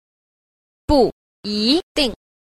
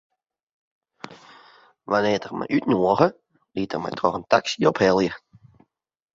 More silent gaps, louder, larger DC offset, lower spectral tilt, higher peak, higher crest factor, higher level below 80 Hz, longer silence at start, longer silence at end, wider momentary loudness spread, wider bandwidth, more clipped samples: first, 1.12-1.43 s, 1.83-1.95 s vs none; first, -19 LUFS vs -22 LUFS; neither; about the same, -5 dB/octave vs -5.5 dB/octave; about the same, -2 dBFS vs -2 dBFS; about the same, 18 dB vs 22 dB; first, -36 dBFS vs -58 dBFS; second, 0.9 s vs 1.05 s; second, 0.3 s vs 1 s; second, 12 LU vs 21 LU; first, 14.5 kHz vs 7.8 kHz; neither